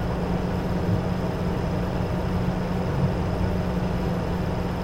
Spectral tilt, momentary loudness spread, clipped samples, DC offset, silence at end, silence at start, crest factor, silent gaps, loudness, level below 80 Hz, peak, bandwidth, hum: -8 dB/octave; 2 LU; under 0.1%; under 0.1%; 0 s; 0 s; 12 dB; none; -26 LUFS; -34 dBFS; -12 dBFS; 16.5 kHz; none